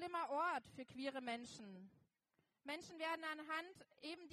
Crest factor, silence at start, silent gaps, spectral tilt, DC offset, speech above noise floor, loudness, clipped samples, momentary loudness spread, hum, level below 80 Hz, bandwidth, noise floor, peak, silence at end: 16 dB; 0 s; none; -3.5 dB/octave; under 0.1%; 38 dB; -47 LUFS; under 0.1%; 17 LU; none; -88 dBFS; 13 kHz; -86 dBFS; -32 dBFS; 0 s